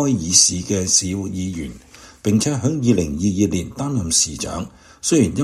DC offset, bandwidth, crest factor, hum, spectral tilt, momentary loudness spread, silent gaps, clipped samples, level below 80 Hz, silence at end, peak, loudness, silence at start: under 0.1%; 14.5 kHz; 20 dB; none; -4 dB/octave; 14 LU; none; under 0.1%; -42 dBFS; 0 s; 0 dBFS; -18 LUFS; 0 s